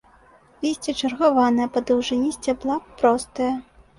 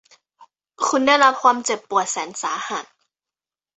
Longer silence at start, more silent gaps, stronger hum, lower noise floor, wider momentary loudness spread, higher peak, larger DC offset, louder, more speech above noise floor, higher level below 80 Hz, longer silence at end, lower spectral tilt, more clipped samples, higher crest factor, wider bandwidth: first, 0.6 s vs 0.4 s; neither; neither; second, -53 dBFS vs under -90 dBFS; second, 8 LU vs 12 LU; second, -6 dBFS vs -2 dBFS; neither; second, -22 LUFS vs -19 LUFS; second, 32 dB vs over 71 dB; first, -54 dBFS vs -72 dBFS; second, 0.35 s vs 0.9 s; first, -4 dB/octave vs -1 dB/octave; neither; about the same, 18 dB vs 20 dB; first, 11.5 kHz vs 8.4 kHz